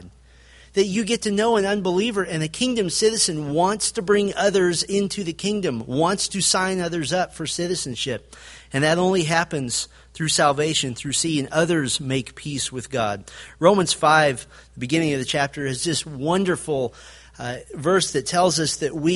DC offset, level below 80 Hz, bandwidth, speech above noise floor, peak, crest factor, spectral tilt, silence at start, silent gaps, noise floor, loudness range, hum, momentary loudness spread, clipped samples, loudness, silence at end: under 0.1%; -52 dBFS; 11.5 kHz; 28 dB; -2 dBFS; 20 dB; -3.5 dB/octave; 0 s; none; -50 dBFS; 3 LU; none; 9 LU; under 0.1%; -21 LUFS; 0 s